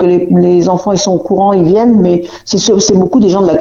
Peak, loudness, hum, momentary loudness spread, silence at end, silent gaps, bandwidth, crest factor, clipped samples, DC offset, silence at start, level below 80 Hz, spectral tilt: 0 dBFS; -9 LUFS; none; 4 LU; 0 s; none; 7.6 kHz; 8 dB; under 0.1%; under 0.1%; 0 s; -40 dBFS; -6 dB/octave